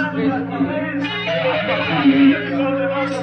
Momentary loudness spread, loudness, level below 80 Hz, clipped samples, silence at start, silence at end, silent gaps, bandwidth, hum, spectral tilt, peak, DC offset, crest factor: 8 LU; -18 LUFS; -54 dBFS; under 0.1%; 0 s; 0 s; none; 6.4 kHz; none; -7 dB/octave; -4 dBFS; under 0.1%; 14 dB